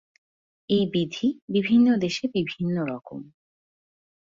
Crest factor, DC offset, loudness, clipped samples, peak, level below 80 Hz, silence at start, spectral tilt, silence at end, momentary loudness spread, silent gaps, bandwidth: 16 dB; under 0.1%; -24 LUFS; under 0.1%; -10 dBFS; -62 dBFS; 0.7 s; -6.5 dB/octave; 1.1 s; 14 LU; 1.42-1.48 s; 7.6 kHz